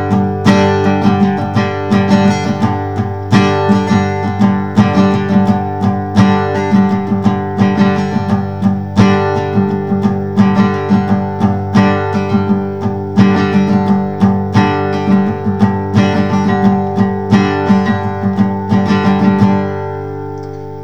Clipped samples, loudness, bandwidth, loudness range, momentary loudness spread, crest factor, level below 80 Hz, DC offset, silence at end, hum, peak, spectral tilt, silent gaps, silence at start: 0.1%; -13 LUFS; 7.8 kHz; 1 LU; 5 LU; 12 dB; -46 dBFS; 2%; 0 s; none; 0 dBFS; -8 dB/octave; none; 0 s